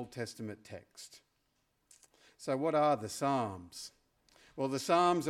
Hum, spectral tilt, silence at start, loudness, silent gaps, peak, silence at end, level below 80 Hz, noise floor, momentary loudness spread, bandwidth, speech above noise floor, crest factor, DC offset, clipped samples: none; -5 dB/octave; 0 s; -34 LUFS; none; -16 dBFS; 0 s; -74 dBFS; -78 dBFS; 22 LU; 16 kHz; 44 dB; 20 dB; under 0.1%; under 0.1%